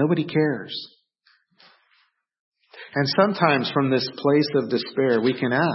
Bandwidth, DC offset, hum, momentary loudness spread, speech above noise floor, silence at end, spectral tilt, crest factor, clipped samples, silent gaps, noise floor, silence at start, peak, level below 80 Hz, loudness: 6 kHz; under 0.1%; none; 10 LU; 44 dB; 0 s; -8.5 dB/octave; 20 dB; under 0.1%; 2.40-2.52 s; -65 dBFS; 0 s; -4 dBFS; -70 dBFS; -22 LUFS